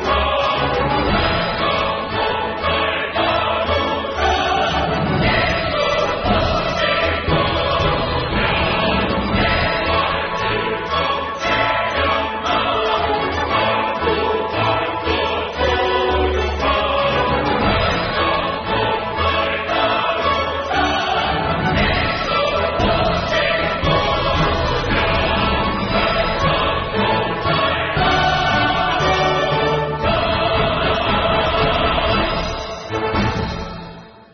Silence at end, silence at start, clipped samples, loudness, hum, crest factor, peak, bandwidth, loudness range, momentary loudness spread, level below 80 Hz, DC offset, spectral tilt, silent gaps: 0.15 s; 0 s; under 0.1%; -18 LUFS; none; 14 dB; -4 dBFS; 6.4 kHz; 1 LU; 3 LU; -30 dBFS; under 0.1%; -2.5 dB/octave; none